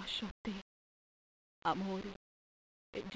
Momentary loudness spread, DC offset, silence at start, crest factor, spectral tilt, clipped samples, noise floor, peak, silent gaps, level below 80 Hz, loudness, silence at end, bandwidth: 12 LU; under 0.1%; 0 s; 22 dB; -5 dB/octave; under 0.1%; under -90 dBFS; -22 dBFS; 0.31-0.45 s, 0.62-1.62 s, 2.16-2.93 s; -66 dBFS; -42 LUFS; 0 s; 8 kHz